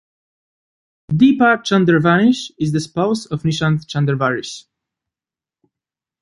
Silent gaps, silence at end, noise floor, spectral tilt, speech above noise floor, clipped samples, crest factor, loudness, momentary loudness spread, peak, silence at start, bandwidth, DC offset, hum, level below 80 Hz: none; 1.6 s; under -90 dBFS; -6.5 dB/octave; over 74 dB; under 0.1%; 16 dB; -16 LUFS; 9 LU; -2 dBFS; 1.1 s; 11.5 kHz; under 0.1%; none; -52 dBFS